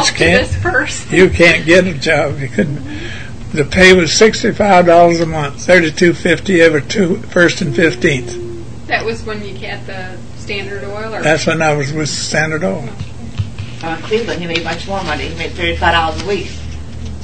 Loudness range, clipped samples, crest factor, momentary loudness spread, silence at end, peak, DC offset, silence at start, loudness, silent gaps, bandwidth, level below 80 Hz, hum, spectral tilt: 9 LU; 0.2%; 14 dB; 17 LU; 0 s; 0 dBFS; 4%; 0 s; -13 LUFS; none; 11 kHz; -32 dBFS; none; -4.5 dB/octave